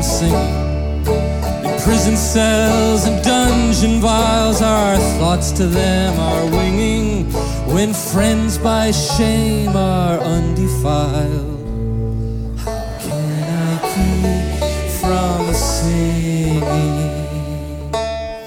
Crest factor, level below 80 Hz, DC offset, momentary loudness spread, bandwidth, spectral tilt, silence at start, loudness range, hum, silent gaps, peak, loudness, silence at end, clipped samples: 14 dB; -24 dBFS; under 0.1%; 8 LU; 18 kHz; -5 dB/octave; 0 s; 6 LU; none; none; -2 dBFS; -16 LUFS; 0 s; under 0.1%